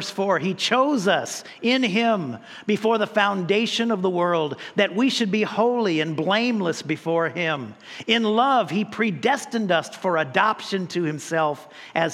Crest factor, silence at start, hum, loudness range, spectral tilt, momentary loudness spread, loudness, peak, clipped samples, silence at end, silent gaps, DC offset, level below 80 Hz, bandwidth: 18 dB; 0 s; none; 1 LU; -4.5 dB/octave; 7 LU; -22 LUFS; -4 dBFS; under 0.1%; 0 s; none; under 0.1%; -76 dBFS; 13.5 kHz